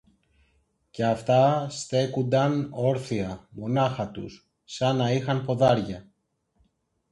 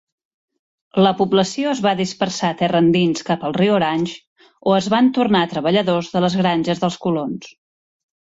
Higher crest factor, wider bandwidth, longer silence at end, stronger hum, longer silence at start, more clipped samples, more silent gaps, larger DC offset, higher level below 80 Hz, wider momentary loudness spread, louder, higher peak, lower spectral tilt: about the same, 20 dB vs 16 dB; first, 11.5 kHz vs 8 kHz; first, 1.1 s vs 0.85 s; neither; about the same, 0.95 s vs 0.95 s; neither; second, none vs 4.27-4.36 s; neither; about the same, -58 dBFS vs -58 dBFS; first, 15 LU vs 8 LU; second, -25 LUFS vs -18 LUFS; second, -8 dBFS vs -4 dBFS; about the same, -6.5 dB/octave vs -5.5 dB/octave